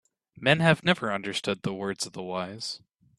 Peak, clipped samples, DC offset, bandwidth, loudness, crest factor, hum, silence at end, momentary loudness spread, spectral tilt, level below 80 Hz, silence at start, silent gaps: -4 dBFS; under 0.1%; under 0.1%; 12.5 kHz; -27 LUFS; 24 dB; none; 0.4 s; 13 LU; -4.5 dB/octave; -64 dBFS; 0.4 s; none